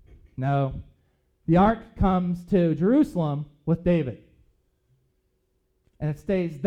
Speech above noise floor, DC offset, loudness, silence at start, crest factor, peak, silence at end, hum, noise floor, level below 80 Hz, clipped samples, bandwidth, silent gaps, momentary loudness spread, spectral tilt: 48 dB; under 0.1%; -24 LUFS; 0.4 s; 18 dB; -8 dBFS; 0 s; none; -71 dBFS; -42 dBFS; under 0.1%; 8.6 kHz; none; 12 LU; -9.5 dB/octave